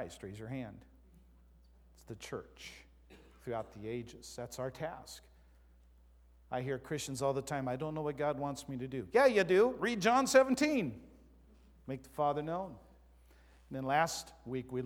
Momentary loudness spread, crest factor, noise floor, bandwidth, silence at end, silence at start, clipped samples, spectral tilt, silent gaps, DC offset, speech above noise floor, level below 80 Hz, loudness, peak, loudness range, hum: 21 LU; 22 dB; -62 dBFS; 17 kHz; 0 s; 0 s; under 0.1%; -5 dB/octave; none; under 0.1%; 28 dB; -62 dBFS; -34 LUFS; -14 dBFS; 16 LU; none